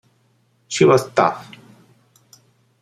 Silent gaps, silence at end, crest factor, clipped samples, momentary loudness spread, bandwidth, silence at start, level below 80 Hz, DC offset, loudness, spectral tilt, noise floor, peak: none; 1.4 s; 20 dB; under 0.1%; 14 LU; 13.5 kHz; 0.7 s; -62 dBFS; under 0.1%; -17 LUFS; -5 dB/octave; -61 dBFS; -2 dBFS